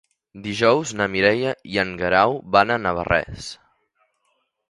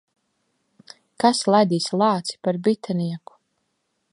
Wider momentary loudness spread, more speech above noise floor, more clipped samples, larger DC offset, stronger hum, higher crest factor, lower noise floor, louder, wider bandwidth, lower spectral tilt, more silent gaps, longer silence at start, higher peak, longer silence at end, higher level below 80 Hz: first, 14 LU vs 8 LU; about the same, 50 dB vs 53 dB; neither; neither; neither; about the same, 22 dB vs 20 dB; about the same, -70 dBFS vs -73 dBFS; about the same, -20 LUFS vs -21 LUFS; about the same, 11.5 kHz vs 11.5 kHz; about the same, -4.5 dB/octave vs -5.5 dB/octave; neither; second, 0.35 s vs 1.2 s; about the same, 0 dBFS vs -2 dBFS; first, 1.15 s vs 0.95 s; first, -48 dBFS vs -74 dBFS